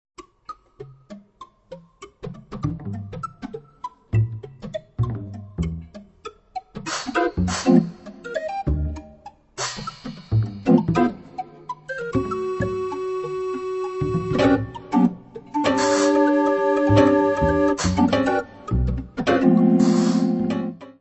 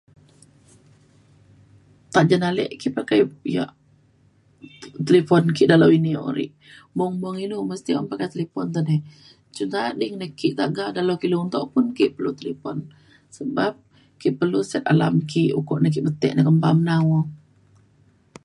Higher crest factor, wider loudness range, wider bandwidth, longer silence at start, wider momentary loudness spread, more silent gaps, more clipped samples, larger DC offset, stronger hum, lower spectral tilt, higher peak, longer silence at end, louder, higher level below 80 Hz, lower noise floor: about the same, 20 dB vs 22 dB; first, 11 LU vs 6 LU; second, 8.4 kHz vs 11 kHz; second, 0.2 s vs 2.1 s; first, 20 LU vs 13 LU; neither; neither; neither; neither; about the same, -6.5 dB/octave vs -7 dB/octave; second, -4 dBFS vs 0 dBFS; second, 0.1 s vs 1.1 s; about the same, -22 LUFS vs -22 LUFS; first, -38 dBFS vs -64 dBFS; second, -47 dBFS vs -58 dBFS